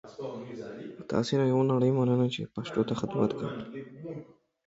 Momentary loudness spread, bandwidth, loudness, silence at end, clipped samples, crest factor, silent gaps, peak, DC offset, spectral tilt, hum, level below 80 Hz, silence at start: 17 LU; 8 kHz; -29 LUFS; 0.45 s; under 0.1%; 18 dB; none; -12 dBFS; under 0.1%; -7.5 dB/octave; none; -64 dBFS; 0.05 s